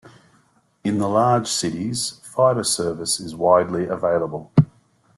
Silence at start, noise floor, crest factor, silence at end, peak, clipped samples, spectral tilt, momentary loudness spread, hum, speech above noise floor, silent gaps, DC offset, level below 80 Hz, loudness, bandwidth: 0.05 s; -60 dBFS; 20 dB; 0.5 s; -2 dBFS; under 0.1%; -5 dB/octave; 8 LU; none; 39 dB; none; under 0.1%; -54 dBFS; -21 LUFS; 12.5 kHz